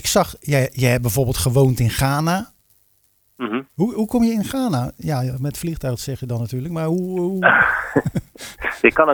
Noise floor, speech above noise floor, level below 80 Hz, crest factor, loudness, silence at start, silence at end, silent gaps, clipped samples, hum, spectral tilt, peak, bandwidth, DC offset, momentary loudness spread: -61 dBFS; 42 dB; -40 dBFS; 20 dB; -20 LUFS; 0 s; 0 s; none; under 0.1%; none; -5.5 dB/octave; 0 dBFS; over 20 kHz; under 0.1%; 11 LU